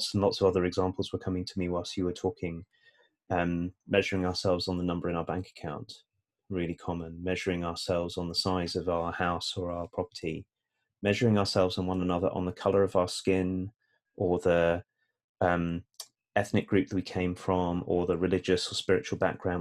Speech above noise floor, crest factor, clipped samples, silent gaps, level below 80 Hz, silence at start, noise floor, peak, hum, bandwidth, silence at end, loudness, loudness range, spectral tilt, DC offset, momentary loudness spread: 54 dB; 20 dB; under 0.1%; 15.24-15.35 s; -60 dBFS; 0 s; -84 dBFS; -10 dBFS; none; 13.5 kHz; 0 s; -30 LUFS; 4 LU; -5.5 dB/octave; under 0.1%; 10 LU